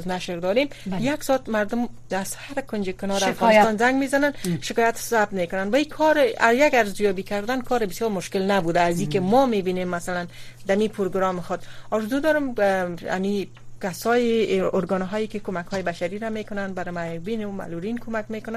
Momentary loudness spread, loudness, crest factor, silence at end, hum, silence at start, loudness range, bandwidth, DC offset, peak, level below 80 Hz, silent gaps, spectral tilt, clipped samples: 11 LU; -23 LUFS; 20 dB; 0 s; none; 0 s; 5 LU; 15 kHz; under 0.1%; -4 dBFS; -48 dBFS; none; -5 dB/octave; under 0.1%